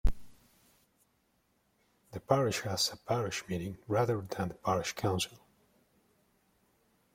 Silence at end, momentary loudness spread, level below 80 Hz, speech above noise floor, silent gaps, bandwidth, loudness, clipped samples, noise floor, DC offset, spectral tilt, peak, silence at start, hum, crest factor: 1.8 s; 9 LU; -46 dBFS; 41 dB; none; 16.5 kHz; -33 LUFS; under 0.1%; -74 dBFS; under 0.1%; -4.5 dB/octave; -12 dBFS; 0.05 s; none; 24 dB